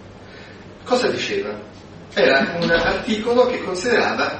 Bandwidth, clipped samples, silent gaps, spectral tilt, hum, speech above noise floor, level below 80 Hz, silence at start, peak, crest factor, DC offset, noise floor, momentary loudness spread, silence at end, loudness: 8.8 kHz; under 0.1%; none; -4 dB/octave; none; 21 dB; -46 dBFS; 0 s; -2 dBFS; 18 dB; under 0.1%; -39 dBFS; 23 LU; 0 s; -19 LUFS